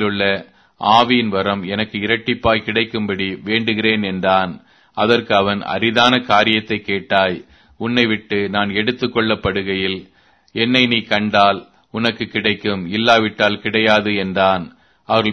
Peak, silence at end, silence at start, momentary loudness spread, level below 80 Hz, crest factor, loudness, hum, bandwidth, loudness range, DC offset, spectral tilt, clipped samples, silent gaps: 0 dBFS; 0 s; 0 s; 8 LU; -48 dBFS; 18 dB; -17 LUFS; none; 7.6 kHz; 2 LU; under 0.1%; -5.5 dB/octave; under 0.1%; none